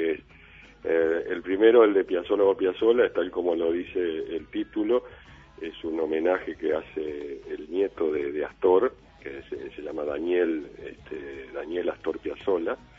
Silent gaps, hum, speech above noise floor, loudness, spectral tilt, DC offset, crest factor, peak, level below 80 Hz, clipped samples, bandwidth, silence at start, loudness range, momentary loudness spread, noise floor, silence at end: none; none; 25 dB; -26 LUFS; -7 dB/octave; under 0.1%; 20 dB; -6 dBFS; -58 dBFS; under 0.1%; 5.8 kHz; 0 s; 7 LU; 16 LU; -51 dBFS; 0.2 s